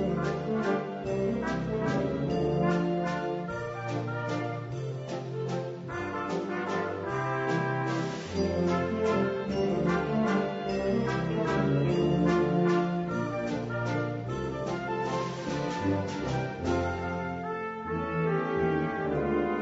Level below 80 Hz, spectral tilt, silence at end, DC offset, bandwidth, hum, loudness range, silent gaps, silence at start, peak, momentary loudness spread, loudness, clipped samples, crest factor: -52 dBFS; -7 dB/octave; 0 s; under 0.1%; 8 kHz; none; 5 LU; none; 0 s; -14 dBFS; 7 LU; -30 LUFS; under 0.1%; 16 dB